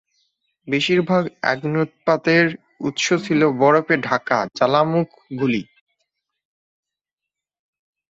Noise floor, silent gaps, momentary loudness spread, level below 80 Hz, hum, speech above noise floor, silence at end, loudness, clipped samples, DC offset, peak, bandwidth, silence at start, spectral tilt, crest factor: -86 dBFS; none; 8 LU; -62 dBFS; none; 67 dB; 2.55 s; -19 LUFS; under 0.1%; under 0.1%; -2 dBFS; 8 kHz; 0.65 s; -5.5 dB/octave; 20 dB